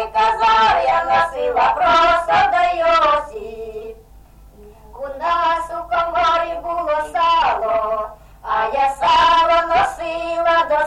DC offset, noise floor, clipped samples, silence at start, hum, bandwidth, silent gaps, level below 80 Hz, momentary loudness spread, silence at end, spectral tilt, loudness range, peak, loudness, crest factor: under 0.1%; -44 dBFS; under 0.1%; 0 s; none; 12 kHz; none; -42 dBFS; 17 LU; 0 s; -3 dB/octave; 6 LU; -6 dBFS; -16 LUFS; 12 dB